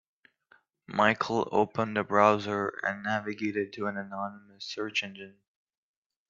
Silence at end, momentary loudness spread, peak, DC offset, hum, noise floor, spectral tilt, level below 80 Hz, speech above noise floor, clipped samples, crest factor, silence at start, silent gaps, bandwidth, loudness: 1 s; 16 LU; -6 dBFS; under 0.1%; none; -65 dBFS; -5 dB/octave; -72 dBFS; 36 dB; under 0.1%; 24 dB; 0.9 s; none; 7.6 kHz; -29 LUFS